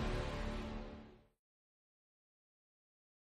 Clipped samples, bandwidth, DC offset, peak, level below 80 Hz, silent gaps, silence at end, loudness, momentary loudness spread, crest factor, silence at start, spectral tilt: under 0.1%; 12 kHz; under 0.1%; -28 dBFS; -50 dBFS; none; 2.1 s; -45 LUFS; 15 LU; 18 dB; 0 s; -6 dB/octave